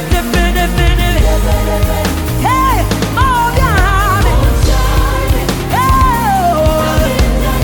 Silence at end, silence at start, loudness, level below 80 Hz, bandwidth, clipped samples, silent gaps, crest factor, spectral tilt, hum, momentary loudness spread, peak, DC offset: 0 s; 0 s; -12 LUFS; -14 dBFS; 19.5 kHz; under 0.1%; none; 10 dB; -5 dB/octave; none; 3 LU; 0 dBFS; under 0.1%